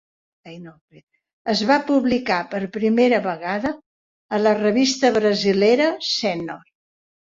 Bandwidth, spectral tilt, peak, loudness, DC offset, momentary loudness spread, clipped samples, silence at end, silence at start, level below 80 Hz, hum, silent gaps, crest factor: 7.8 kHz; -4.5 dB/octave; -2 dBFS; -19 LUFS; under 0.1%; 15 LU; under 0.1%; 0.7 s; 0.45 s; -60 dBFS; none; 0.81-0.88 s, 1.03-1.07 s, 1.33-1.45 s, 3.86-4.29 s; 18 dB